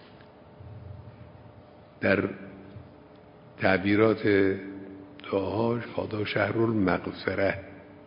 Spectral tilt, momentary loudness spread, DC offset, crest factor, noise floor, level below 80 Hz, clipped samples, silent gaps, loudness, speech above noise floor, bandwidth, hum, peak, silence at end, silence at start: -10.5 dB/octave; 23 LU; under 0.1%; 22 dB; -51 dBFS; -54 dBFS; under 0.1%; none; -27 LUFS; 25 dB; 5.4 kHz; none; -6 dBFS; 0 s; 0 s